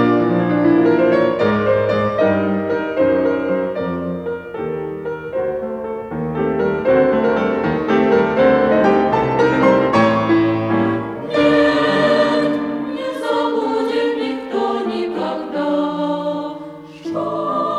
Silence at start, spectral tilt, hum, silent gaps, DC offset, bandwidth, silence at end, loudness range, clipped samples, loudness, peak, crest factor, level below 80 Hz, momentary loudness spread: 0 s; -7.5 dB/octave; none; none; under 0.1%; 11 kHz; 0 s; 7 LU; under 0.1%; -17 LUFS; -2 dBFS; 14 dB; -50 dBFS; 11 LU